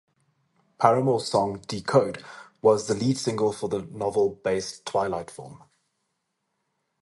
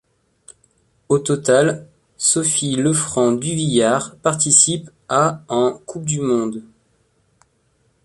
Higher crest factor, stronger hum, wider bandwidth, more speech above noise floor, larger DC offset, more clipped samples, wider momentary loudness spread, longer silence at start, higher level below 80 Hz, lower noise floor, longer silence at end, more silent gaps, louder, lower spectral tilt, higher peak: about the same, 24 dB vs 20 dB; neither; about the same, 11.5 kHz vs 11.5 kHz; first, 53 dB vs 45 dB; neither; neither; first, 13 LU vs 10 LU; second, 0.8 s vs 1.1 s; about the same, -60 dBFS vs -56 dBFS; first, -78 dBFS vs -62 dBFS; about the same, 1.5 s vs 1.45 s; neither; second, -25 LUFS vs -17 LUFS; first, -5.5 dB/octave vs -3.5 dB/octave; about the same, -2 dBFS vs 0 dBFS